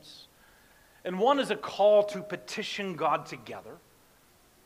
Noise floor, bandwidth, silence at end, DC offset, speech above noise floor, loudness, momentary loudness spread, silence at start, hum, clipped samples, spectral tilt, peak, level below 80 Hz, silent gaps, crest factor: -61 dBFS; 15.5 kHz; 0.9 s; under 0.1%; 33 dB; -28 LUFS; 19 LU; 0.05 s; none; under 0.1%; -4.5 dB/octave; -12 dBFS; -70 dBFS; none; 18 dB